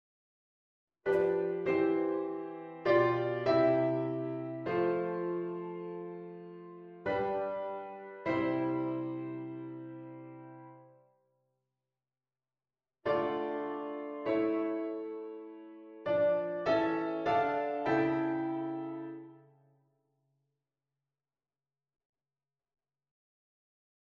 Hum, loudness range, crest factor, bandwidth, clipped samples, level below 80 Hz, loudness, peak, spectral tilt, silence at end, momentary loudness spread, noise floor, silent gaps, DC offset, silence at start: none; 12 LU; 20 dB; 6.2 kHz; under 0.1%; -72 dBFS; -33 LUFS; -14 dBFS; -8.5 dB/octave; 4.65 s; 17 LU; under -90 dBFS; none; under 0.1%; 1.05 s